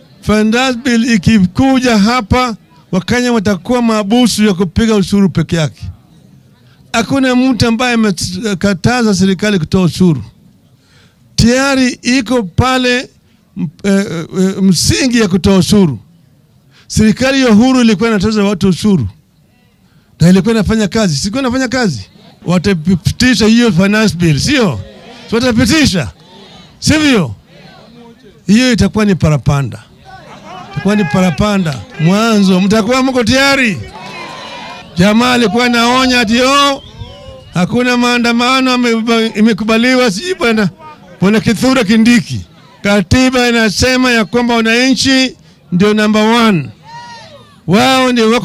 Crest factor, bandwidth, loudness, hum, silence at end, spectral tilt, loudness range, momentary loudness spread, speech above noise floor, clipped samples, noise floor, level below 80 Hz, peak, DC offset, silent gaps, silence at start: 12 dB; 15 kHz; -11 LUFS; none; 0 s; -5 dB/octave; 3 LU; 12 LU; 39 dB; under 0.1%; -49 dBFS; -34 dBFS; 0 dBFS; under 0.1%; none; 0.25 s